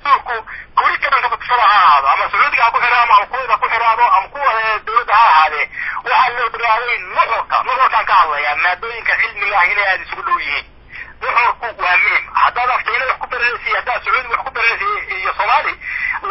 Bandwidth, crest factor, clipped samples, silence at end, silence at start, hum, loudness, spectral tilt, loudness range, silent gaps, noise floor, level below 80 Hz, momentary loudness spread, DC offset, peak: 5.8 kHz; 14 dB; under 0.1%; 0 s; 0.05 s; none; -14 LUFS; -5.5 dB/octave; 4 LU; none; -34 dBFS; -46 dBFS; 8 LU; under 0.1%; 0 dBFS